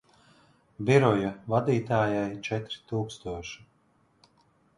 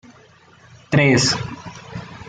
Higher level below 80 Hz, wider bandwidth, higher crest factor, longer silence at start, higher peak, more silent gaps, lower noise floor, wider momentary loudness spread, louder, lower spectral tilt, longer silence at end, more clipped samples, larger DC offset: second, -58 dBFS vs -52 dBFS; first, 11 kHz vs 9.4 kHz; about the same, 22 dB vs 18 dB; about the same, 0.8 s vs 0.9 s; about the same, -6 dBFS vs -4 dBFS; neither; first, -67 dBFS vs -49 dBFS; second, 15 LU vs 20 LU; second, -28 LUFS vs -17 LUFS; first, -7 dB/octave vs -4.5 dB/octave; first, 1.2 s vs 0 s; neither; neither